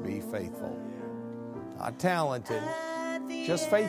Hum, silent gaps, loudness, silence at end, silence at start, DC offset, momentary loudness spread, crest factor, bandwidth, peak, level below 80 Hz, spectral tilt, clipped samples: none; none; -33 LUFS; 0 s; 0 s; under 0.1%; 12 LU; 20 dB; 16 kHz; -14 dBFS; -64 dBFS; -5 dB/octave; under 0.1%